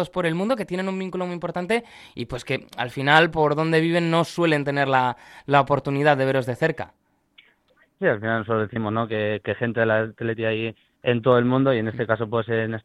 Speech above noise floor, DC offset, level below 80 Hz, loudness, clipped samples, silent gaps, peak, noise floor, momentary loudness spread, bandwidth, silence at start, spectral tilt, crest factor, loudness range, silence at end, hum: 40 dB; under 0.1%; -56 dBFS; -22 LUFS; under 0.1%; none; -2 dBFS; -62 dBFS; 10 LU; 13 kHz; 0 s; -6.5 dB/octave; 20 dB; 5 LU; 0.05 s; none